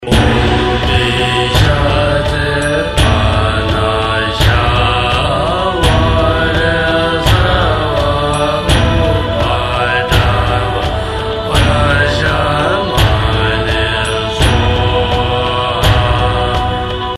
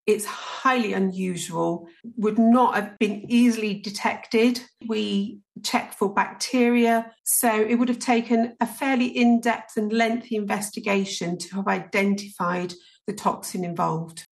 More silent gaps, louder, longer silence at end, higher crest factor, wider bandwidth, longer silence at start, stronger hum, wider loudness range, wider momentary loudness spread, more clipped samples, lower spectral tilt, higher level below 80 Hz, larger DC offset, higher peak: second, none vs 7.20-7.24 s; first, -12 LUFS vs -23 LUFS; about the same, 0 s vs 0.1 s; second, 12 dB vs 18 dB; about the same, 14 kHz vs 13 kHz; about the same, 0 s vs 0.05 s; neither; second, 1 LU vs 4 LU; second, 3 LU vs 9 LU; neither; about the same, -5.5 dB/octave vs -4.5 dB/octave; first, -20 dBFS vs -72 dBFS; neither; first, 0 dBFS vs -6 dBFS